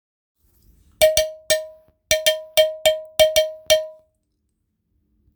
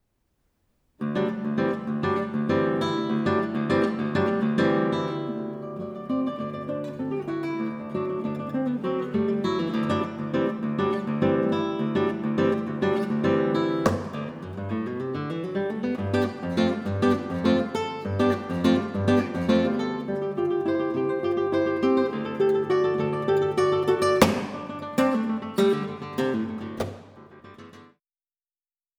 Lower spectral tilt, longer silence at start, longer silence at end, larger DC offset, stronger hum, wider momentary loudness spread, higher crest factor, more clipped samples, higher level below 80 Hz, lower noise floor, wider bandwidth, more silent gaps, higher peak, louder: second, 0 dB/octave vs -7 dB/octave; about the same, 1 s vs 1 s; first, 1.45 s vs 1.15 s; neither; neither; second, 5 LU vs 8 LU; about the same, 22 dB vs 24 dB; neither; first, -50 dBFS vs -60 dBFS; second, -72 dBFS vs under -90 dBFS; about the same, over 20 kHz vs 19.5 kHz; neither; about the same, 0 dBFS vs -2 dBFS; first, -19 LUFS vs -26 LUFS